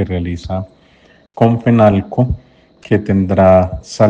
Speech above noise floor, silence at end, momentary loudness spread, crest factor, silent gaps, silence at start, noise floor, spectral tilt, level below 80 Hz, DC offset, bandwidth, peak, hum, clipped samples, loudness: 36 dB; 0 s; 14 LU; 14 dB; none; 0 s; -48 dBFS; -8 dB/octave; -36 dBFS; under 0.1%; 8.8 kHz; 0 dBFS; none; under 0.1%; -14 LUFS